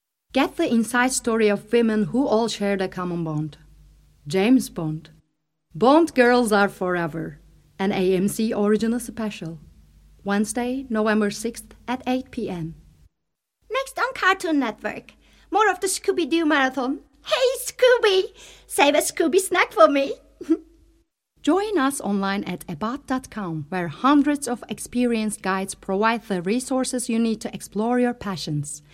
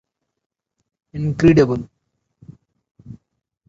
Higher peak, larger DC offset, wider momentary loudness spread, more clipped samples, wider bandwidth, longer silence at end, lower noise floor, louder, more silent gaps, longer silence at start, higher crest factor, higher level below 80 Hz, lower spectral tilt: about the same, 0 dBFS vs -2 dBFS; neither; second, 12 LU vs 22 LU; neither; first, 16.5 kHz vs 7.6 kHz; second, 0.15 s vs 0.55 s; first, -80 dBFS vs -54 dBFS; second, -22 LUFS vs -17 LUFS; second, none vs 2.91-2.95 s; second, 0.35 s vs 1.15 s; about the same, 22 dB vs 20 dB; second, -54 dBFS vs -44 dBFS; second, -4.5 dB/octave vs -8 dB/octave